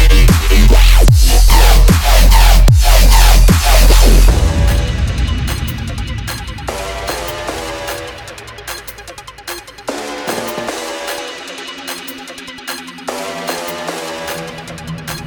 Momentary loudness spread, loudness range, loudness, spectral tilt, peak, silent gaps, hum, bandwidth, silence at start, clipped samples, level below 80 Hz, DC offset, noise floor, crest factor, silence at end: 17 LU; 14 LU; -13 LUFS; -4 dB/octave; 0 dBFS; none; none; 19.5 kHz; 0 s; under 0.1%; -12 dBFS; under 0.1%; -33 dBFS; 10 dB; 0 s